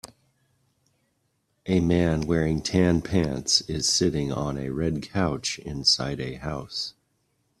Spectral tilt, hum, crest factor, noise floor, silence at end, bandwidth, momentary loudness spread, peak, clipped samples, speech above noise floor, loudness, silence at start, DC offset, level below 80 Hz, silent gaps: -4.5 dB/octave; none; 20 dB; -72 dBFS; 0.7 s; 13.5 kHz; 10 LU; -6 dBFS; under 0.1%; 48 dB; -25 LUFS; 0.05 s; under 0.1%; -46 dBFS; none